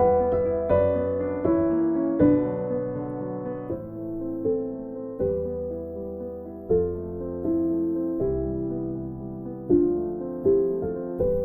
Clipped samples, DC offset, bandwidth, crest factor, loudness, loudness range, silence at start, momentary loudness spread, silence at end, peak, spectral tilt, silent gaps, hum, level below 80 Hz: under 0.1%; under 0.1%; 3.7 kHz; 18 dB; -26 LUFS; 6 LU; 0 s; 12 LU; 0 s; -8 dBFS; -12.5 dB/octave; none; none; -46 dBFS